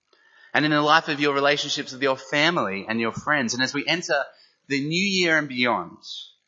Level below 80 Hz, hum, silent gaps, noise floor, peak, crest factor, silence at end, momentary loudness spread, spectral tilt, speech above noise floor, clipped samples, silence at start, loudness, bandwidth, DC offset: -70 dBFS; none; none; -56 dBFS; -2 dBFS; 22 dB; 0.2 s; 8 LU; -3.5 dB/octave; 33 dB; under 0.1%; 0.55 s; -22 LUFS; 7.8 kHz; under 0.1%